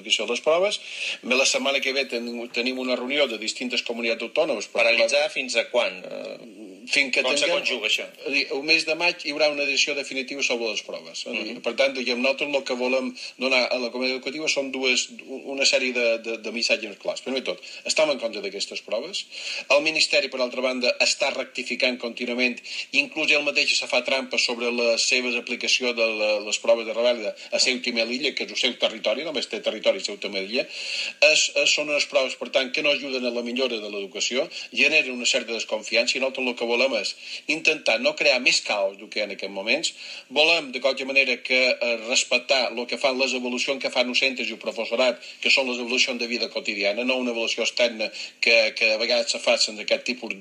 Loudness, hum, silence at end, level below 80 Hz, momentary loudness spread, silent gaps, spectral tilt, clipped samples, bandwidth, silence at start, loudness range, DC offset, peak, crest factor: -22 LUFS; none; 0 s; -86 dBFS; 10 LU; none; -0.5 dB/octave; under 0.1%; 11.5 kHz; 0 s; 3 LU; under 0.1%; -4 dBFS; 20 dB